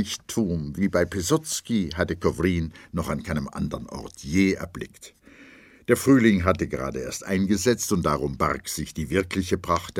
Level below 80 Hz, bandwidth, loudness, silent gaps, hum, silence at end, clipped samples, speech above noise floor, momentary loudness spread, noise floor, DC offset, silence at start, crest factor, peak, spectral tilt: -44 dBFS; 16.5 kHz; -25 LUFS; none; none; 0 s; under 0.1%; 26 dB; 10 LU; -50 dBFS; under 0.1%; 0 s; 22 dB; -4 dBFS; -5 dB/octave